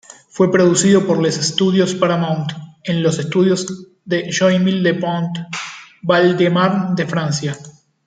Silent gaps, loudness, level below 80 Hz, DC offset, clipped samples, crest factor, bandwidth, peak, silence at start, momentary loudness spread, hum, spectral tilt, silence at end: none; -16 LUFS; -58 dBFS; under 0.1%; under 0.1%; 16 dB; 9.4 kHz; -2 dBFS; 0.35 s; 14 LU; none; -5 dB/octave; 0.35 s